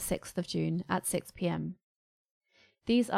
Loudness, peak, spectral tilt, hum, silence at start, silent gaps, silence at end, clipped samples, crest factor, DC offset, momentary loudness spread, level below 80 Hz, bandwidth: -34 LUFS; -14 dBFS; -5 dB/octave; none; 0 s; 1.83-2.41 s; 0 s; under 0.1%; 18 dB; under 0.1%; 12 LU; -60 dBFS; 16 kHz